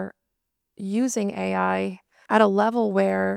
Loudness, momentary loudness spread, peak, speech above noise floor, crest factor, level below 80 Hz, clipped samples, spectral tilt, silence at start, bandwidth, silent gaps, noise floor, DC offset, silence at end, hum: -23 LUFS; 11 LU; -4 dBFS; 58 dB; 20 dB; -72 dBFS; under 0.1%; -5.5 dB/octave; 0 s; 14 kHz; none; -80 dBFS; under 0.1%; 0 s; none